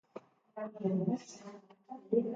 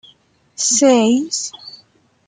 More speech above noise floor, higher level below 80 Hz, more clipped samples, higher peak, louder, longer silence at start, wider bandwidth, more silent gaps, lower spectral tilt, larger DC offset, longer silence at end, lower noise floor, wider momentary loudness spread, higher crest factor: second, 17 dB vs 39 dB; second, -82 dBFS vs -66 dBFS; neither; second, -18 dBFS vs -2 dBFS; second, -36 LUFS vs -15 LUFS; second, 0.15 s vs 0.6 s; second, 7.8 kHz vs 9.6 kHz; neither; first, -8 dB/octave vs -2.5 dB/octave; neither; second, 0 s vs 0.55 s; about the same, -54 dBFS vs -53 dBFS; second, 20 LU vs 24 LU; about the same, 20 dB vs 16 dB